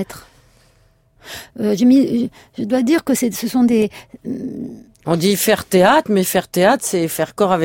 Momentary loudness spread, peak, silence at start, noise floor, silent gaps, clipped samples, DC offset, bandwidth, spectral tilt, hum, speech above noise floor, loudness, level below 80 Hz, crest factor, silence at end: 18 LU; -2 dBFS; 0 s; -55 dBFS; none; under 0.1%; under 0.1%; 17 kHz; -5 dB/octave; none; 39 dB; -16 LUFS; -54 dBFS; 16 dB; 0 s